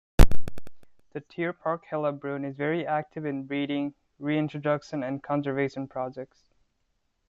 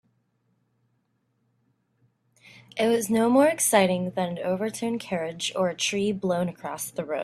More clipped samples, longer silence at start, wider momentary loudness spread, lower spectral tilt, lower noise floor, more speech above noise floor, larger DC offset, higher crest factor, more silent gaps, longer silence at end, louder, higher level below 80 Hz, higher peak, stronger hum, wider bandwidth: neither; second, 0.2 s vs 2.75 s; about the same, 13 LU vs 11 LU; first, -7 dB/octave vs -4 dB/octave; about the same, -74 dBFS vs -72 dBFS; about the same, 44 dB vs 47 dB; neither; about the same, 22 dB vs 22 dB; neither; first, 1.05 s vs 0 s; second, -30 LUFS vs -25 LUFS; first, -32 dBFS vs -68 dBFS; first, -2 dBFS vs -6 dBFS; neither; second, 8.2 kHz vs 15.5 kHz